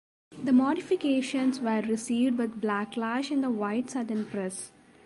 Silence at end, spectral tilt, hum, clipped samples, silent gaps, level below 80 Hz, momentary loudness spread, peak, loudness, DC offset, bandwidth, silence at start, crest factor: 0.4 s; -5 dB/octave; none; under 0.1%; none; -72 dBFS; 9 LU; -14 dBFS; -28 LUFS; under 0.1%; 11.5 kHz; 0.3 s; 14 dB